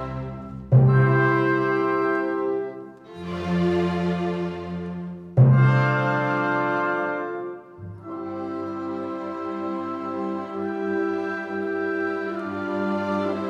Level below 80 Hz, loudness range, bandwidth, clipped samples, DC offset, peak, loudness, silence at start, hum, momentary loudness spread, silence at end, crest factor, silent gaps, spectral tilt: -52 dBFS; 8 LU; 6.2 kHz; under 0.1%; under 0.1%; -6 dBFS; -24 LUFS; 0 s; none; 16 LU; 0 s; 18 dB; none; -9 dB/octave